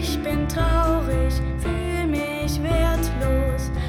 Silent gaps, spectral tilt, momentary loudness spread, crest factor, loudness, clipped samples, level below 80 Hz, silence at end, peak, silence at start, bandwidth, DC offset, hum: none; -6 dB/octave; 4 LU; 14 dB; -23 LUFS; under 0.1%; -24 dBFS; 0 s; -8 dBFS; 0 s; 16 kHz; under 0.1%; none